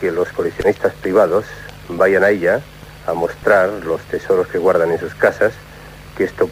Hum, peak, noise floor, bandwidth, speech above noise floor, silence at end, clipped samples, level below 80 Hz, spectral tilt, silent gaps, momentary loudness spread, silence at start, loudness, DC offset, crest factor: none; 0 dBFS; -37 dBFS; 16 kHz; 21 dB; 0 s; under 0.1%; -44 dBFS; -6 dB/octave; none; 18 LU; 0 s; -17 LUFS; under 0.1%; 16 dB